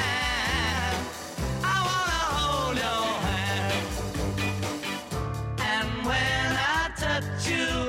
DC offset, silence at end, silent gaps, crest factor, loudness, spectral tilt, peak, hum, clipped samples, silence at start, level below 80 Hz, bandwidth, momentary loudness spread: under 0.1%; 0 s; none; 14 dB; -27 LUFS; -4 dB/octave; -14 dBFS; none; under 0.1%; 0 s; -40 dBFS; 16 kHz; 7 LU